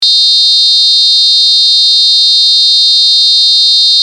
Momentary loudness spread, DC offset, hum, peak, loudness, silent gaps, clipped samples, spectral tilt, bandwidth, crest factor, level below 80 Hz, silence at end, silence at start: 0 LU; under 0.1%; none; 0 dBFS; -3 LUFS; none; under 0.1%; 7.5 dB/octave; 13.5 kHz; 6 dB; -80 dBFS; 0 s; 0 s